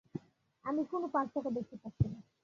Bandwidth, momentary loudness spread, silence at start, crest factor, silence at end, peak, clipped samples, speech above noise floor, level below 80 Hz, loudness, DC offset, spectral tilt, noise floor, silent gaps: 7.2 kHz; 12 LU; 0.15 s; 20 dB; 0.25 s; -18 dBFS; under 0.1%; 21 dB; -54 dBFS; -37 LUFS; under 0.1%; -9 dB/octave; -57 dBFS; none